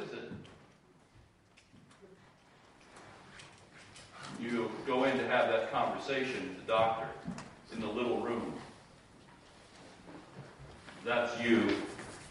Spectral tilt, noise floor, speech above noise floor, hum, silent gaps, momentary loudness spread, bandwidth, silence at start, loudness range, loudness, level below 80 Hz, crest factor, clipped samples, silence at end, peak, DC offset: -5 dB/octave; -64 dBFS; 31 dB; none; none; 24 LU; 11 kHz; 0 s; 18 LU; -34 LUFS; -68 dBFS; 20 dB; under 0.1%; 0 s; -18 dBFS; under 0.1%